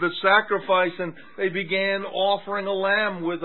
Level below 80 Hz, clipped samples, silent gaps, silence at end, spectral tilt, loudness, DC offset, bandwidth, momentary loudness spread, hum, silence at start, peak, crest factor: -78 dBFS; under 0.1%; none; 0 s; -9 dB/octave; -23 LUFS; 0.5%; 4.3 kHz; 8 LU; none; 0 s; -4 dBFS; 18 dB